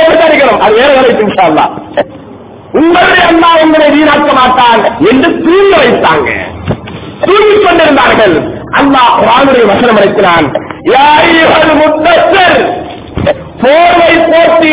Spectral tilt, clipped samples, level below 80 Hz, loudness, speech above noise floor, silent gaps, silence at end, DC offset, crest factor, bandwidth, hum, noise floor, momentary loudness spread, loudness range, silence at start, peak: -8.5 dB/octave; 2%; -34 dBFS; -5 LUFS; 23 dB; none; 0 s; under 0.1%; 6 dB; 4 kHz; none; -28 dBFS; 10 LU; 2 LU; 0 s; 0 dBFS